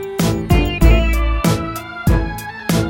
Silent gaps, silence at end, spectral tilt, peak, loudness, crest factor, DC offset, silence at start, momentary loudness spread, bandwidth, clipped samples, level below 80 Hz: none; 0 s; -6 dB/octave; 0 dBFS; -17 LUFS; 16 dB; under 0.1%; 0 s; 10 LU; 17.5 kHz; under 0.1%; -18 dBFS